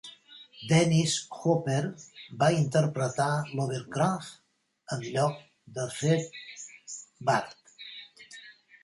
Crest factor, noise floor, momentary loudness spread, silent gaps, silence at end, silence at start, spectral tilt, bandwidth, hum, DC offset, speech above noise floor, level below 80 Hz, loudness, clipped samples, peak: 18 dB; -53 dBFS; 21 LU; none; 0.3 s; 0.05 s; -5.5 dB/octave; 11.5 kHz; none; under 0.1%; 25 dB; -66 dBFS; -28 LUFS; under 0.1%; -10 dBFS